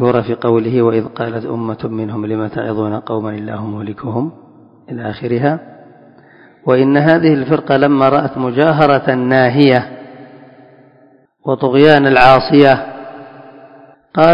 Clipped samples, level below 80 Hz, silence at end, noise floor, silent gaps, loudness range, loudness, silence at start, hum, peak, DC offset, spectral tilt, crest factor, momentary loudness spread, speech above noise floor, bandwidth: 0.3%; -48 dBFS; 0 s; -49 dBFS; none; 9 LU; -13 LUFS; 0 s; none; 0 dBFS; under 0.1%; -8.5 dB/octave; 14 dB; 16 LU; 36 dB; 6.4 kHz